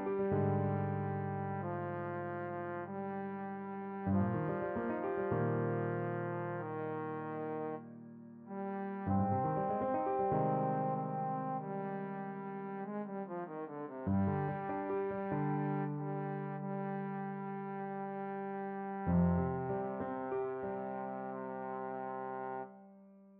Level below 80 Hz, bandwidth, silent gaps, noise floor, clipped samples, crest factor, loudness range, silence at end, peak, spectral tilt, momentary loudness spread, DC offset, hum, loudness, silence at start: -64 dBFS; 3.7 kHz; none; -59 dBFS; under 0.1%; 16 dB; 5 LU; 0 s; -20 dBFS; -9 dB/octave; 9 LU; under 0.1%; none; -38 LUFS; 0 s